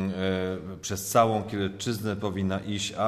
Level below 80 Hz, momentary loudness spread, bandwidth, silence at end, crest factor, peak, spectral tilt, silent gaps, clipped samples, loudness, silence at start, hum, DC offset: -58 dBFS; 10 LU; 14 kHz; 0 s; 20 dB; -8 dBFS; -5 dB/octave; none; under 0.1%; -28 LUFS; 0 s; none; under 0.1%